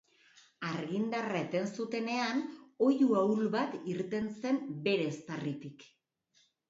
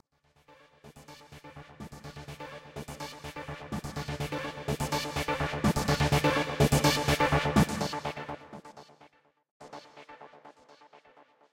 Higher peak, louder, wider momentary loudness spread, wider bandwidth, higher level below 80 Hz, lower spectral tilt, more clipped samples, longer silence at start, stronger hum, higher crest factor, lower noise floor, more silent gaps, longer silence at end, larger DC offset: second, -16 dBFS vs -10 dBFS; second, -33 LUFS vs -29 LUFS; second, 11 LU vs 24 LU; second, 7.8 kHz vs 16.5 kHz; second, -76 dBFS vs -46 dBFS; about the same, -6 dB/octave vs -5 dB/octave; neither; about the same, 0.6 s vs 0.5 s; neither; second, 16 dB vs 22 dB; first, -72 dBFS vs -65 dBFS; second, none vs 9.51-9.60 s; first, 0.85 s vs 0.55 s; neither